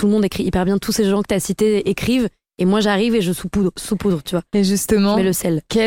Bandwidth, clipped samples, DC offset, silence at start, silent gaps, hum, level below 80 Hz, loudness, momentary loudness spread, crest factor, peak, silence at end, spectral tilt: 17 kHz; under 0.1%; under 0.1%; 0 s; none; none; -40 dBFS; -18 LUFS; 5 LU; 14 dB; -2 dBFS; 0 s; -5.5 dB/octave